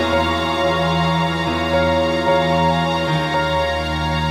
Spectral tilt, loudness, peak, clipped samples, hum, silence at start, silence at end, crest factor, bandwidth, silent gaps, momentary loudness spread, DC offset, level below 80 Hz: -6 dB/octave; -18 LUFS; -4 dBFS; under 0.1%; none; 0 s; 0 s; 12 dB; 14.5 kHz; none; 3 LU; under 0.1%; -34 dBFS